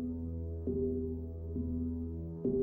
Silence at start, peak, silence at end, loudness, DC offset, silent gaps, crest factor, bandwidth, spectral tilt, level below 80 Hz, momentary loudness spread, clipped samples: 0 s; -22 dBFS; 0 s; -38 LUFS; under 0.1%; none; 14 dB; 1.4 kHz; -14 dB/octave; -46 dBFS; 6 LU; under 0.1%